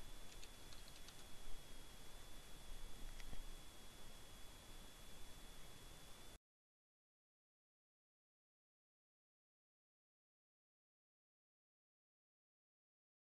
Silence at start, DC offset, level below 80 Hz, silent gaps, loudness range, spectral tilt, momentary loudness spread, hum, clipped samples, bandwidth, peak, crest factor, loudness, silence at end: 0 s; under 0.1%; -60 dBFS; none; 6 LU; -2.5 dB/octave; 2 LU; none; under 0.1%; 13 kHz; -34 dBFS; 18 dB; -60 LUFS; 7 s